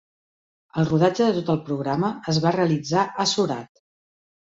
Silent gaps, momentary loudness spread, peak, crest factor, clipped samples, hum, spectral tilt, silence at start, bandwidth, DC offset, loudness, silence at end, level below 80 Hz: none; 6 LU; -6 dBFS; 18 dB; under 0.1%; none; -5.5 dB/octave; 0.75 s; 8 kHz; under 0.1%; -22 LUFS; 0.95 s; -60 dBFS